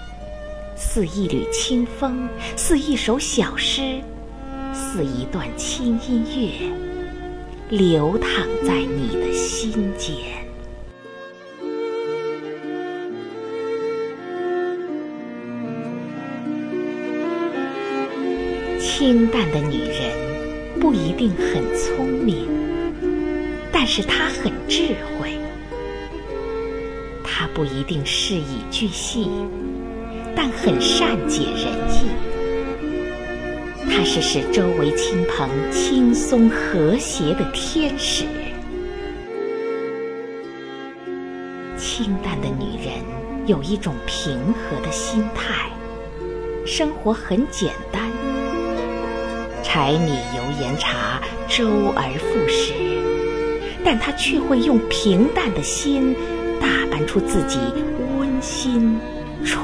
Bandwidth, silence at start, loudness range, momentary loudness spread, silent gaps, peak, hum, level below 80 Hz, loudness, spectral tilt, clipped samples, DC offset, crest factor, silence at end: 11 kHz; 0 s; 8 LU; 12 LU; none; -2 dBFS; none; -34 dBFS; -22 LUFS; -4.5 dB/octave; under 0.1%; 0.4%; 20 dB; 0 s